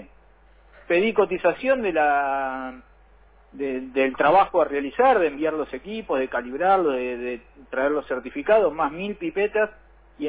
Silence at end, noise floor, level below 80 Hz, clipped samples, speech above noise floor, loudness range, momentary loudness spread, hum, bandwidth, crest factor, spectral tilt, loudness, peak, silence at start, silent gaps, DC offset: 0 s; -54 dBFS; -54 dBFS; under 0.1%; 31 dB; 3 LU; 12 LU; none; 4 kHz; 16 dB; -9 dB/octave; -23 LUFS; -8 dBFS; 0 s; none; under 0.1%